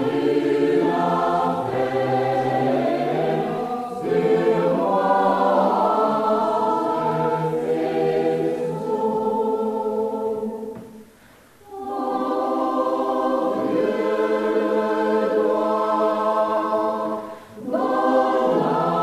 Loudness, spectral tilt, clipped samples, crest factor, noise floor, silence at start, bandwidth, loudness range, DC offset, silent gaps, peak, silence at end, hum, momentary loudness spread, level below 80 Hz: -21 LUFS; -7 dB/octave; under 0.1%; 14 dB; -50 dBFS; 0 s; 14 kHz; 6 LU; under 0.1%; none; -8 dBFS; 0 s; none; 7 LU; -64 dBFS